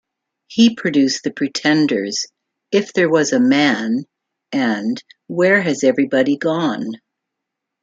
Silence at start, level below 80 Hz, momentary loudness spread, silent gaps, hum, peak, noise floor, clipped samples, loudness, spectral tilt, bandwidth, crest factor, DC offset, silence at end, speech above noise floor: 0.5 s; -66 dBFS; 11 LU; none; none; -2 dBFS; -80 dBFS; under 0.1%; -17 LUFS; -4.5 dB/octave; 8 kHz; 16 dB; under 0.1%; 0.85 s; 64 dB